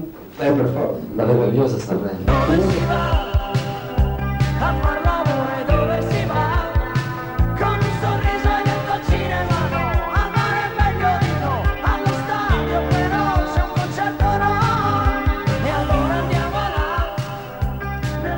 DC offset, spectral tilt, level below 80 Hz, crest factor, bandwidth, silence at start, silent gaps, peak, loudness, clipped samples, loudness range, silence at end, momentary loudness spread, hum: under 0.1%; -7 dB/octave; -26 dBFS; 16 dB; 16.5 kHz; 0 s; none; -4 dBFS; -20 LUFS; under 0.1%; 1 LU; 0 s; 6 LU; none